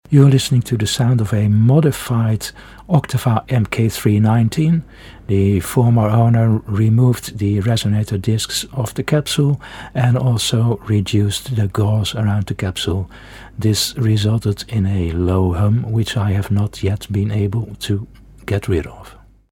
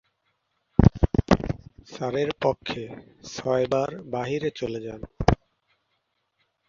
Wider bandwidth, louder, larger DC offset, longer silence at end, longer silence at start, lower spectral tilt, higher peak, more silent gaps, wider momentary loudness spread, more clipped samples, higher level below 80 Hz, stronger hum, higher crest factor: first, 17.5 kHz vs 7.4 kHz; first, -17 LUFS vs -26 LUFS; neither; second, 0.4 s vs 1.35 s; second, 0.1 s vs 0.8 s; about the same, -6 dB/octave vs -7 dB/octave; about the same, 0 dBFS vs 0 dBFS; neither; second, 9 LU vs 16 LU; neither; about the same, -40 dBFS vs -36 dBFS; neither; second, 16 dB vs 26 dB